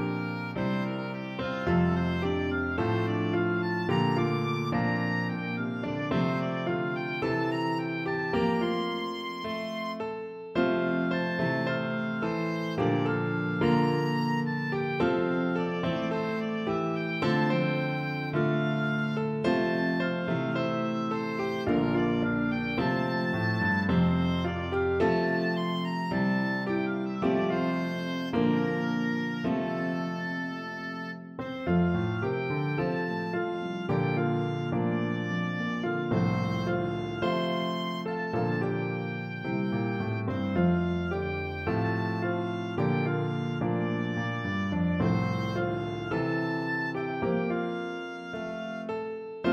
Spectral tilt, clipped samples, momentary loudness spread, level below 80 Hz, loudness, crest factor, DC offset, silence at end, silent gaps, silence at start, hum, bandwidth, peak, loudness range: -8 dB/octave; under 0.1%; 6 LU; -54 dBFS; -29 LUFS; 16 dB; under 0.1%; 0 s; none; 0 s; none; 7.8 kHz; -14 dBFS; 3 LU